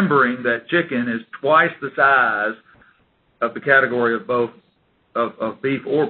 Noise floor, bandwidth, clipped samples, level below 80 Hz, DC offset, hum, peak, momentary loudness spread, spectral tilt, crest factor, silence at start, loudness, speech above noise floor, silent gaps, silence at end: -62 dBFS; 4.5 kHz; under 0.1%; -64 dBFS; under 0.1%; none; 0 dBFS; 10 LU; -10.5 dB/octave; 20 dB; 0 s; -19 LUFS; 43 dB; none; 0 s